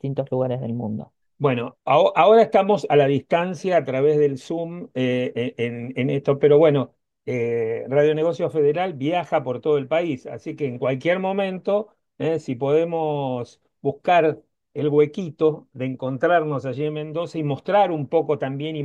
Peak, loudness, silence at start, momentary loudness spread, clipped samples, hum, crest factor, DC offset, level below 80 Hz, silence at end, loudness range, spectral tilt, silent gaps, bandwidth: -4 dBFS; -21 LUFS; 0.05 s; 11 LU; under 0.1%; none; 18 dB; under 0.1%; -68 dBFS; 0 s; 5 LU; -7.5 dB/octave; none; 8.6 kHz